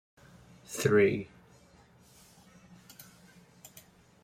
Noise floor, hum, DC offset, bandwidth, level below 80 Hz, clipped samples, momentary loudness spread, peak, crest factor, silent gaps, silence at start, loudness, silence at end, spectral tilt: -60 dBFS; none; under 0.1%; 16 kHz; -68 dBFS; under 0.1%; 28 LU; -12 dBFS; 22 dB; none; 0.7 s; -28 LUFS; 3 s; -5.5 dB/octave